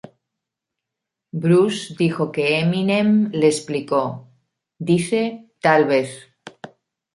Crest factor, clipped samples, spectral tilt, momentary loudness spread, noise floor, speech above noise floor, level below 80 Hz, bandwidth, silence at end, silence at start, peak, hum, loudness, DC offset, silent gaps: 20 dB; under 0.1%; -6 dB/octave; 15 LU; -83 dBFS; 65 dB; -66 dBFS; 11.5 kHz; 0.5 s; 1.35 s; -2 dBFS; none; -19 LUFS; under 0.1%; none